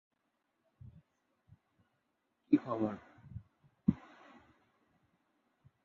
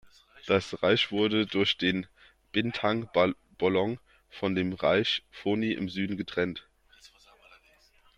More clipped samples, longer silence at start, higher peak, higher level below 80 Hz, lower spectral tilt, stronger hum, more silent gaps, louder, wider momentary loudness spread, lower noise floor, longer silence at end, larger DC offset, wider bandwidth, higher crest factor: neither; first, 2.5 s vs 0.35 s; about the same, -14 dBFS vs -12 dBFS; about the same, -66 dBFS vs -62 dBFS; first, -9 dB/octave vs -6 dB/octave; neither; neither; second, -36 LUFS vs -28 LUFS; first, 26 LU vs 8 LU; first, -82 dBFS vs -62 dBFS; first, 1.9 s vs 1.1 s; neither; second, 4.4 kHz vs 10.5 kHz; first, 26 dB vs 18 dB